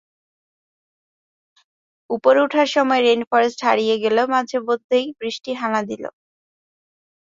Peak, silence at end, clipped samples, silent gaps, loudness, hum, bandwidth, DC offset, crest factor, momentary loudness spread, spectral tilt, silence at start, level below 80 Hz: -2 dBFS; 1.2 s; under 0.1%; 3.27-3.31 s, 4.84-4.89 s; -19 LUFS; none; 7.8 kHz; under 0.1%; 20 dB; 12 LU; -4 dB/octave; 2.1 s; -70 dBFS